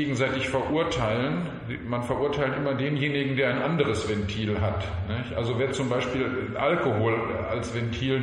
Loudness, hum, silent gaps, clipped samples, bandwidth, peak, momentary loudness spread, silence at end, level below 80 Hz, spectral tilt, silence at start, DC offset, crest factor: -27 LUFS; none; none; under 0.1%; 10.5 kHz; -10 dBFS; 6 LU; 0 s; -46 dBFS; -6 dB/octave; 0 s; under 0.1%; 18 dB